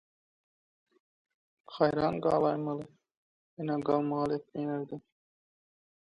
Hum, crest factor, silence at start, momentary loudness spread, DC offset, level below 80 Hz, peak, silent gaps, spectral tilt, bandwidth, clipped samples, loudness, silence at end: none; 22 dB; 1.7 s; 15 LU; under 0.1%; -68 dBFS; -12 dBFS; 3.17-3.57 s; -8.5 dB/octave; 10.5 kHz; under 0.1%; -31 LUFS; 1.15 s